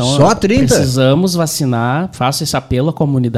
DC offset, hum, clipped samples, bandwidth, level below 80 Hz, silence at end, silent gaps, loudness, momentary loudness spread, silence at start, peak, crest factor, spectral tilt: under 0.1%; none; under 0.1%; 15.5 kHz; -36 dBFS; 0 s; none; -13 LUFS; 5 LU; 0 s; 0 dBFS; 12 dB; -5.5 dB/octave